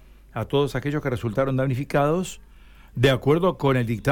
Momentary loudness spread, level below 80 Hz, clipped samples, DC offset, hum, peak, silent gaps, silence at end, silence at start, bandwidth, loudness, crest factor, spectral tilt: 13 LU; -46 dBFS; under 0.1%; under 0.1%; none; -6 dBFS; none; 0 s; 0.35 s; 18 kHz; -23 LUFS; 18 dB; -6.5 dB/octave